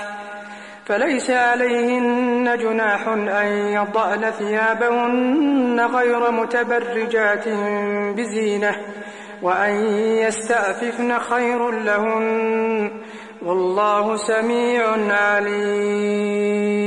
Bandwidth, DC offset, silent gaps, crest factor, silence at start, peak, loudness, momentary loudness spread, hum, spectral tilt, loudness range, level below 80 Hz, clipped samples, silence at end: 11 kHz; under 0.1%; none; 12 dB; 0 s; -6 dBFS; -19 LUFS; 6 LU; none; -4.5 dB/octave; 2 LU; -68 dBFS; under 0.1%; 0 s